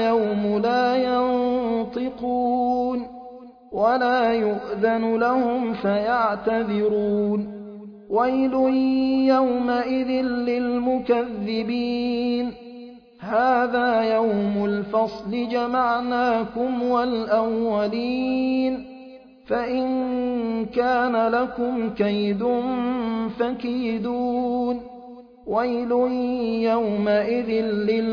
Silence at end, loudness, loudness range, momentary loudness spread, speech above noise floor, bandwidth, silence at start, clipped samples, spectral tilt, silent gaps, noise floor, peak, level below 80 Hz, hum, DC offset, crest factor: 0 s; -23 LUFS; 3 LU; 7 LU; 22 dB; 5.4 kHz; 0 s; under 0.1%; -8 dB/octave; none; -44 dBFS; -8 dBFS; -56 dBFS; none; under 0.1%; 16 dB